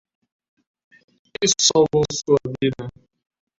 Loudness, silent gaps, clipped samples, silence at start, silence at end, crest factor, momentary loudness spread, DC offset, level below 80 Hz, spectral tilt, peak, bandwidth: -19 LUFS; none; under 0.1%; 1.4 s; 0.7 s; 22 dB; 19 LU; under 0.1%; -54 dBFS; -3.5 dB/octave; 0 dBFS; 8 kHz